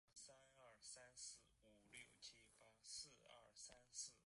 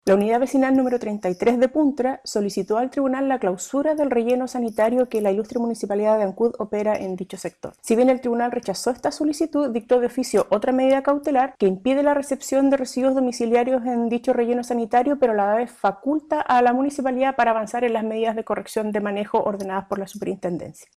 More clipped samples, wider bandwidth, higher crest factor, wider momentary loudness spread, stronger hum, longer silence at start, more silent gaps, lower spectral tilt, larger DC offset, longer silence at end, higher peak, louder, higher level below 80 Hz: neither; second, 11.5 kHz vs 14.5 kHz; first, 22 dB vs 12 dB; first, 11 LU vs 7 LU; neither; about the same, 0.05 s vs 0.05 s; neither; second, 0 dB/octave vs -5.5 dB/octave; neither; second, 0 s vs 0.15 s; second, -42 dBFS vs -8 dBFS; second, -60 LUFS vs -22 LUFS; second, -86 dBFS vs -60 dBFS